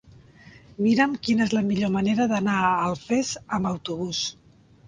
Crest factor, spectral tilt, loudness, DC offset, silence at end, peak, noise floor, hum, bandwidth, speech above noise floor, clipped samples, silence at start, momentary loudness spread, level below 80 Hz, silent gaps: 18 dB; -5 dB/octave; -24 LUFS; under 0.1%; 0.55 s; -6 dBFS; -50 dBFS; none; 9.6 kHz; 26 dB; under 0.1%; 0.45 s; 7 LU; -56 dBFS; none